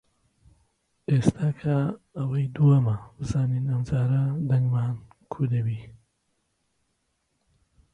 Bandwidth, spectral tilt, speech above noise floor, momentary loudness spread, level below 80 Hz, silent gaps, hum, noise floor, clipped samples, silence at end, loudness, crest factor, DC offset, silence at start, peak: 10.5 kHz; -9 dB/octave; 50 dB; 11 LU; -52 dBFS; none; none; -74 dBFS; under 0.1%; 2.05 s; -25 LUFS; 20 dB; under 0.1%; 1.1 s; -6 dBFS